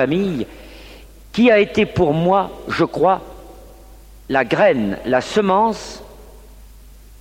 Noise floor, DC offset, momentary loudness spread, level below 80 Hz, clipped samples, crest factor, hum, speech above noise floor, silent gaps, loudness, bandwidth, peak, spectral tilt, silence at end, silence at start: -42 dBFS; under 0.1%; 17 LU; -42 dBFS; under 0.1%; 16 dB; none; 25 dB; none; -17 LUFS; 16.5 kHz; -2 dBFS; -6 dB/octave; 0.55 s; 0 s